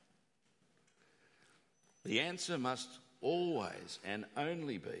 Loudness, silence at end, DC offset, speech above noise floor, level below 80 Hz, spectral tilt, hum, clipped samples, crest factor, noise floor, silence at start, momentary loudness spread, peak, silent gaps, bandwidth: -39 LUFS; 0 s; under 0.1%; 38 dB; -88 dBFS; -4 dB/octave; none; under 0.1%; 24 dB; -77 dBFS; 2.05 s; 9 LU; -18 dBFS; none; 11.5 kHz